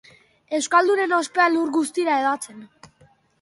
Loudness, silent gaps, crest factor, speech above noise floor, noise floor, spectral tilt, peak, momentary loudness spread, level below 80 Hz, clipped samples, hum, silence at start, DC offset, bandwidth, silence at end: -21 LUFS; none; 18 dB; 37 dB; -58 dBFS; -2 dB/octave; -4 dBFS; 10 LU; -72 dBFS; under 0.1%; none; 0.5 s; under 0.1%; 11.5 kHz; 0.75 s